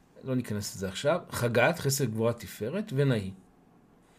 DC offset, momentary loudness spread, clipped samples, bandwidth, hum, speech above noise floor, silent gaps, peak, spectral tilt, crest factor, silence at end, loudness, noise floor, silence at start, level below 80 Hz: under 0.1%; 9 LU; under 0.1%; 15.5 kHz; none; 31 dB; none; -8 dBFS; -5 dB/octave; 22 dB; 0.8 s; -29 LUFS; -60 dBFS; 0.15 s; -64 dBFS